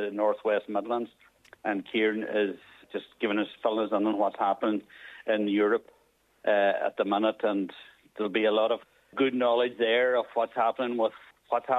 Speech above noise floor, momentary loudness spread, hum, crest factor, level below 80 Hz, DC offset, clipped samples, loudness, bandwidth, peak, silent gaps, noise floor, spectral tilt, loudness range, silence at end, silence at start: 39 dB; 11 LU; none; 16 dB; -78 dBFS; under 0.1%; under 0.1%; -28 LUFS; 7.8 kHz; -12 dBFS; none; -66 dBFS; -6.5 dB/octave; 3 LU; 0 s; 0 s